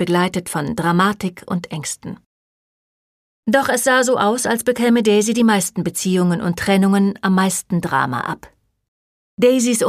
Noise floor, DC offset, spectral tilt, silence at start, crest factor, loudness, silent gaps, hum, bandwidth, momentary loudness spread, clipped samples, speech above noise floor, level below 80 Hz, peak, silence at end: under -90 dBFS; under 0.1%; -4.5 dB/octave; 0 s; 18 dB; -17 LUFS; 2.26-3.43 s, 8.88-9.37 s; none; 15.5 kHz; 11 LU; under 0.1%; over 73 dB; -54 dBFS; 0 dBFS; 0 s